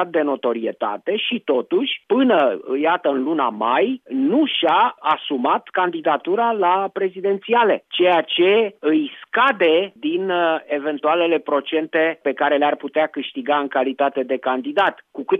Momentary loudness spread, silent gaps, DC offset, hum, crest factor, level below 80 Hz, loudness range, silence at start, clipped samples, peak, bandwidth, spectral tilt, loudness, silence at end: 6 LU; none; under 0.1%; none; 14 dB; -82 dBFS; 2 LU; 0 s; under 0.1%; -6 dBFS; 4.9 kHz; -7 dB/octave; -19 LUFS; 0 s